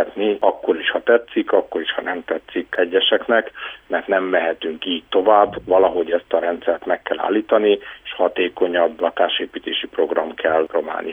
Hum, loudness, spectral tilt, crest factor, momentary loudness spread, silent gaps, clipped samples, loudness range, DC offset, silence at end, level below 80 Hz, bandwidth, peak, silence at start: none; -19 LUFS; -6 dB/octave; 18 dB; 9 LU; none; under 0.1%; 2 LU; under 0.1%; 0 s; -58 dBFS; 3.8 kHz; 0 dBFS; 0 s